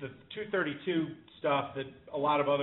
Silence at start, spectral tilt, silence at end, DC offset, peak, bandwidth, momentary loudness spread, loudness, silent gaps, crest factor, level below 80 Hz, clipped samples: 0 s; -3.5 dB/octave; 0 s; under 0.1%; -16 dBFS; 4 kHz; 12 LU; -33 LUFS; none; 16 dB; -70 dBFS; under 0.1%